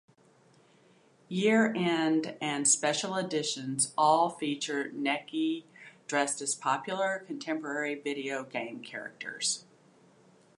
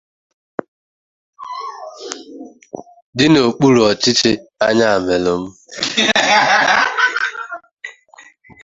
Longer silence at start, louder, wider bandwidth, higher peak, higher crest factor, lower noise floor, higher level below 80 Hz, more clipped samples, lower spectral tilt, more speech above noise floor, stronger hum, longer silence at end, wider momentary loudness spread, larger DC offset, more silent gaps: about the same, 1.3 s vs 1.4 s; second, -30 LUFS vs -14 LUFS; first, 11.5 kHz vs 8 kHz; second, -12 dBFS vs 0 dBFS; about the same, 20 dB vs 16 dB; first, -63 dBFS vs -45 dBFS; second, -84 dBFS vs -52 dBFS; neither; about the same, -3 dB/octave vs -3.5 dB/octave; about the same, 32 dB vs 32 dB; neither; first, 0.95 s vs 0.75 s; second, 12 LU vs 22 LU; neither; second, none vs 3.02-3.13 s, 7.73-7.77 s